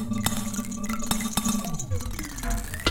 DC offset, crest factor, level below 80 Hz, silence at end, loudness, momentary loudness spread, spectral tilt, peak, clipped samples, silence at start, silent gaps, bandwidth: under 0.1%; 22 dB; -36 dBFS; 0 s; -29 LUFS; 6 LU; -3.5 dB/octave; -6 dBFS; under 0.1%; 0 s; none; 17 kHz